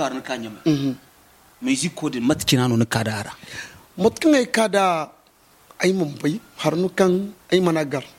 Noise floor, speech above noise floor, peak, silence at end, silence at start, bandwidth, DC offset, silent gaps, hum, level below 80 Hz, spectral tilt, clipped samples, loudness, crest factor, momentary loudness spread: -55 dBFS; 34 dB; -4 dBFS; 0.1 s; 0 s; 17 kHz; under 0.1%; none; none; -56 dBFS; -5 dB/octave; under 0.1%; -21 LUFS; 18 dB; 12 LU